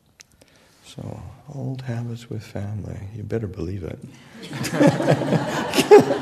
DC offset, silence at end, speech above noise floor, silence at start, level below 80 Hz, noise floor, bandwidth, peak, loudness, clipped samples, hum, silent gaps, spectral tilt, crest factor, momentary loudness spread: under 0.1%; 0 s; 32 dB; 0.2 s; -52 dBFS; -55 dBFS; 13.5 kHz; 0 dBFS; -21 LUFS; under 0.1%; none; none; -6 dB/octave; 22 dB; 22 LU